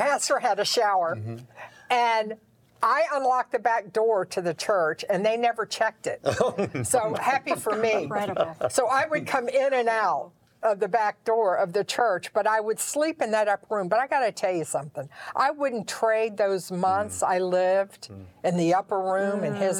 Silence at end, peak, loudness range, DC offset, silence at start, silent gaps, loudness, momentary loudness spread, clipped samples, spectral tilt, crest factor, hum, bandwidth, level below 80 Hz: 0 s; -8 dBFS; 1 LU; under 0.1%; 0 s; none; -25 LUFS; 6 LU; under 0.1%; -3.5 dB/octave; 16 dB; none; 19 kHz; -72 dBFS